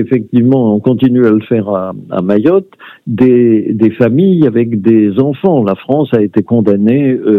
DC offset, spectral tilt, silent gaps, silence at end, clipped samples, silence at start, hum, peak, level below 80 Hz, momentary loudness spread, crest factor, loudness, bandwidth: under 0.1%; -11 dB/octave; none; 0 s; 0.4%; 0 s; none; 0 dBFS; -54 dBFS; 5 LU; 10 dB; -10 LUFS; 4.1 kHz